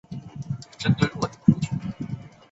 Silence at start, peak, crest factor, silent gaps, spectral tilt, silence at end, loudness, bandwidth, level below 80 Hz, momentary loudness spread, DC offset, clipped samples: 0.1 s; -2 dBFS; 24 dB; none; -6.5 dB/octave; 0.25 s; -26 LUFS; 8 kHz; -50 dBFS; 15 LU; under 0.1%; under 0.1%